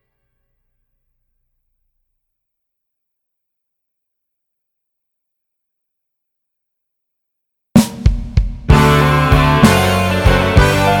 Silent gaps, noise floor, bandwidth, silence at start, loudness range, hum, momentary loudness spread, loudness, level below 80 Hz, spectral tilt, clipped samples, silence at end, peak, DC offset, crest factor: none; -76 dBFS; 18 kHz; 7.75 s; 9 LU; none; 8 LU; -12 LUFS; -24 dBFS; -6 dB/octave; 0.1%; 0 s; 0 dBFS; under 0.1%; 16 dB